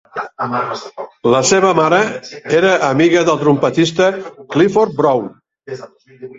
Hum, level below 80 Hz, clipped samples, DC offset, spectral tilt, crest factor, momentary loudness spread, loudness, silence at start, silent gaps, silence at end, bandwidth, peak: none; -56 dBFS; under 0.1%; under 0.1%; -4.5 dB/octave; 14 dB; 17 LU; -14 LUFS; 0.15 s; none; 0.05 s; 8 kHz; 0 dBFS